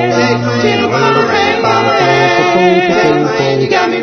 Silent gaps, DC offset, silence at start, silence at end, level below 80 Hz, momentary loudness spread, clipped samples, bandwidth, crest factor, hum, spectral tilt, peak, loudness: none; under 0.1%; 0 s; 0 s; -48 dBFS; 3 LU; under 0.1%; 6.6 kHz; 10 dB; none; -5 dB/octave; 0 dBFS; -10 LUFS